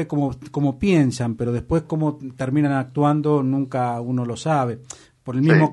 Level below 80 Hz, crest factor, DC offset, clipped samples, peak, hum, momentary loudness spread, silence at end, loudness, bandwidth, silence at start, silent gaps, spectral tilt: -46 dBFS; 18 dB; under 0.1%; under 0.1%; -2 dBFS; none; 8 LU; 0 s; -21 LUFS; 11.5 kHz; 0 s; none; -7.5 dB/octave